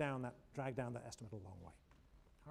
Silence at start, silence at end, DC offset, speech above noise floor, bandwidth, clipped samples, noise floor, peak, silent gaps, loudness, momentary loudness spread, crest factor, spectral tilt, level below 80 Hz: 0 s; 0 s; under 0.1%; 20 dB; 12.5 kHz; under 0.1%; -67 dBFS; -28 dBFS; none; -48 LUFS; 18 LU; 20 dB; -6.5 dB/octave; -68 dBFS